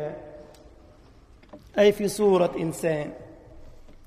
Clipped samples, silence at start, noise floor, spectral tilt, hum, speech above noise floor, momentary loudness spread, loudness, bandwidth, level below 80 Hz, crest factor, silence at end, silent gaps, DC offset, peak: under 0.1%; 0 s; -52 dBFS; -5.5 dB/octave; none; 29 dB; 21 LU; -24 LUFS; 15.5 kHz; -52 dBFS; 18 dB; 0.25 s; none; under 0.1%; -8 dBFS